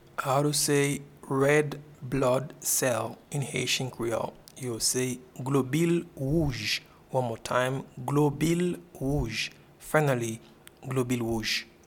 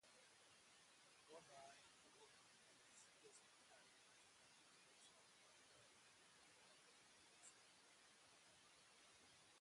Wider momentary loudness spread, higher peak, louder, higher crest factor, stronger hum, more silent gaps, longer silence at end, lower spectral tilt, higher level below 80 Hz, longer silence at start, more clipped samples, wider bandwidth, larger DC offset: first, 10 LU vs 4 LU; first, -8 dBFS vs -50 dBFS; first, -28 LUFS vs -68 LUFS; about the same, 20 dB vs 20 dB; neither; neither; first, 0.2 s vs 0 s; first, -4.5 dB/octave vs -1 dB/octave; first, -50 dBFS vs under -90 dBFS; first, 0.2 s vs 0 s; neither; first, 18.5 kHz vs 11.5 kHz; neither